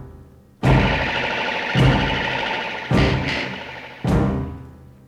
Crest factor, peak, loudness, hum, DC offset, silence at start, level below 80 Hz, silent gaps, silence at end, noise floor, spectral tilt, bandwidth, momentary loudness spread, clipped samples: 18 dB; -4 dBFS; -20 LUFS; none; under 0.1%; 0 s; -30 dBFS; none; 0.2 s; -45 dBFS; -6.5 dB/octave; 11 kHz; 11 LU; under 0.1%